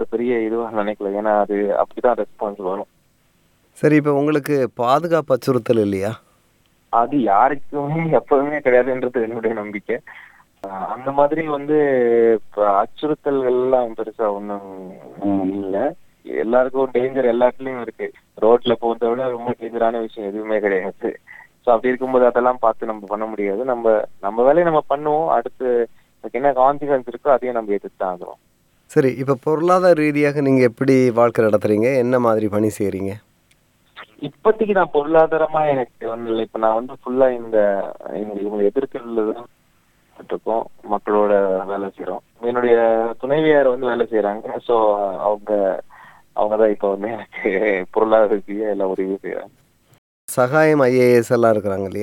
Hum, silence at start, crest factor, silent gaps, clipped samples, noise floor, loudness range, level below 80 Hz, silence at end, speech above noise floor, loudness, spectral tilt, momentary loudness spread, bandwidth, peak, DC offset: none; 0 s; 16 dB; 49.98-50.28 s; under 0.1%; -60 dBFS; 4 LU; -56 dBFS; 0 s; 41 dB; -19 LUFS; -7 dB/octave; 12 LU; 16.5 kHz; -2 dBFS; under 0.1%